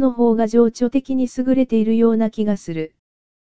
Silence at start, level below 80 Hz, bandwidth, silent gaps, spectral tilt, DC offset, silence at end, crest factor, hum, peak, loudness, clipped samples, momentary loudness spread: 0 s; -52 dBFS; 8 kHz; none; -7.5 dB/octave; 2%; 0.55 s; 14 dB; none; -4 dBFS; -18 LUFS; under 0.1%; 9 LU